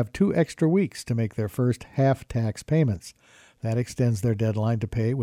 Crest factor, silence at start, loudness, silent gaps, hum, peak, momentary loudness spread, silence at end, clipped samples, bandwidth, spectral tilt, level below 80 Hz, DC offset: 14 dB; 0 s; -25 LUFS; none; none; -10 dBFS; 6 LU; 0 s; under 0.1%; 13.5 kHz; -7.5 dB/octave; -50 dBFS; under 0.1%